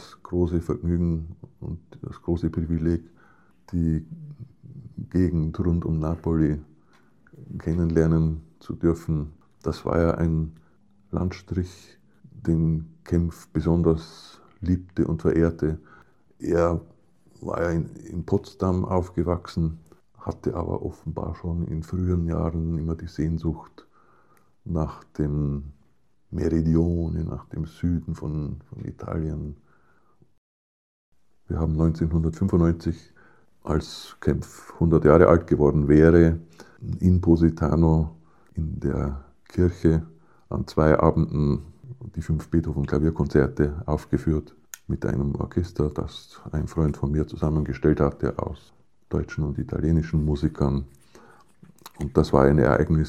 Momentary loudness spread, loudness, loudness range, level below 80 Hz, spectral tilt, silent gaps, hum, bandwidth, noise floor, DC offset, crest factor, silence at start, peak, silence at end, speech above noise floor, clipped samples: 17 LU; -24 LUFS; 9 LU; -36 dBFS; -9 dB/octave; 30.38-31.12 s; none; 8.6 kHz; -66 dBFS; 0.1%; 24 dB; 0 s; 0 dBFS; 0 s; 43 dB; under 0.1%